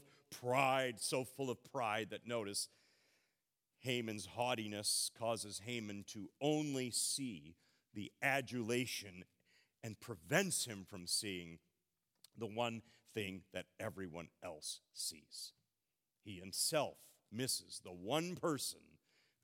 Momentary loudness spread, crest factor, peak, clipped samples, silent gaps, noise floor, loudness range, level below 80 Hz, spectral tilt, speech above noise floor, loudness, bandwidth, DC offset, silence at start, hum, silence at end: 15 LU; 24 dB; -18 dBFS; under 0.1%; none; under -90 dBFS; 7 LU; -86 dBFS; -3 dB/octave; over 48 dB; -41 LUFS; 17.5 kHz; under 0.1%; 0.3 s; none; 0.65 s